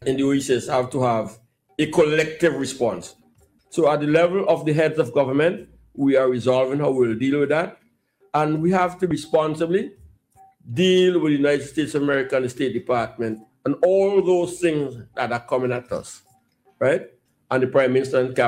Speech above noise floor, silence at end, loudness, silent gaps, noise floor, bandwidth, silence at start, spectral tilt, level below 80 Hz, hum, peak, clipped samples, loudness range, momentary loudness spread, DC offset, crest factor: 41 dB; 0 s; -21 LUFS; none; -61 dBFS; 14.5 kHz; 0 s; -6 dB/octave; -60 dBFS; none; -4 dBFS; under 0.1%; 3 LU; 11 LU; under 0.1%; 18 dB